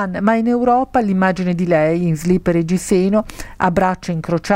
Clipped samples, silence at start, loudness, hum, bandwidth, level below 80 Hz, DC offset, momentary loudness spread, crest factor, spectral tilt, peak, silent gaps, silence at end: under 0.1%; 0 s; -17 LUFS; none; 16 kHz; -40 dBFS; under 0.1%; 5 LU; 14 dB; -7 dB/octave; -2 dBFS; none; 0 s